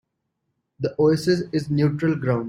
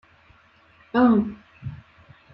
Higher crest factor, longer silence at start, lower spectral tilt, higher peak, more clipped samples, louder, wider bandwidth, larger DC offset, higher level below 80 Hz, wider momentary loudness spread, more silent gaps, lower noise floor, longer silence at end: about the same, 16 dB vs 18 dB; second, 0.8 s vs 0.95 s; second, -7.5 dB/octave vs -10 dB/octave; about the same, -8 dBFS vs -8 dBFS; neither; about the same, -22 LUFS vs -21 LUFS; first, 15.5 kHz vs 5.6 kHz; neither; about the same, -56 dBFS vs -56 dBFS; second, 7 LU vs 20 LU; neither; first, -77 dBFS vs -56 dBFS; second, 0 s vs 0.6 s